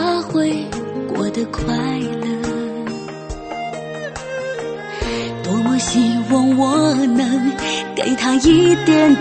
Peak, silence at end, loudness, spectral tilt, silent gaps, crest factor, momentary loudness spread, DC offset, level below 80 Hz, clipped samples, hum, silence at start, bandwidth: -2 dBFS; 0 s; -18 LUFS; -5 dB/octave; none; 16 dB; 14 LU; under 0.1%; -40 dBFS; under 0.1%; none; 0 s; 8.8 kHz